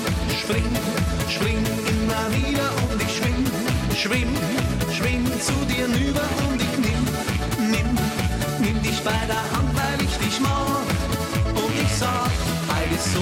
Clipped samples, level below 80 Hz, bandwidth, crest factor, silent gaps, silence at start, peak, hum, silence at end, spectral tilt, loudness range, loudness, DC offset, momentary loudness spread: under 0.1%; -32 dBFS; 17 kHz; 12 dB; none; 0 s; -10 dBFS; none; 0 s; -4.5 dB/octave; 0 LU; -23 LUFS; under 0.1%; 2 LU